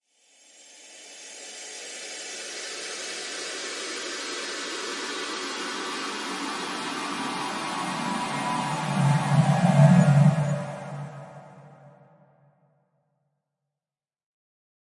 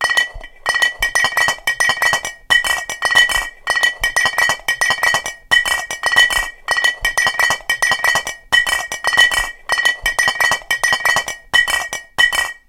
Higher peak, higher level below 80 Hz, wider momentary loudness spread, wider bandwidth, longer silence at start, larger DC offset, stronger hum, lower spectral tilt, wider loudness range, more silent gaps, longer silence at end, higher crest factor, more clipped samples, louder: second, -6 dBFS vs 0 dBFS; second, -70 dBFS vs -40 dBFS; first, 20 LU vs 7 LU; second, 11.5 kHz vs 17 kHz; first, 0.6 s vs 0 s; neither; neither; first, -5 dB/octave vs 1 dB/octave; first, 13 LU vs 0 LU; neither; first, 3.1 s vs 0.15 s; first, 22 dB vs 16 dB; neither; second, -26 LUFS vs -15 LUFS